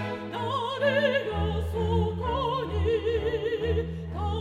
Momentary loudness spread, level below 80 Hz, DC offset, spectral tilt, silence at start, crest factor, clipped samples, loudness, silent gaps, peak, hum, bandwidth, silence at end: 7 LU; -38 dBFS; under 0.1%; -7 dB/octave; 0 s; 16 dB; under 0.1%; -28 LUFS; none; -12 dBFS; none; 10 kHz; 0 s